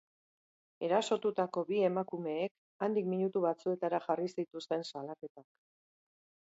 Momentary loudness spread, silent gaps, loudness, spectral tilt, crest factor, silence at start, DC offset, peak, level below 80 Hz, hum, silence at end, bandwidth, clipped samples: 10 LU; 2.51-2.80 s, 5.30-5.35 s; -35 LUFS; -5 dB/octave; 18 dB; 0.8 s; under 0.1%; -18 dBFS; -86 dBFS; none; 1.1 s; 7.6 kHz; under 0.1%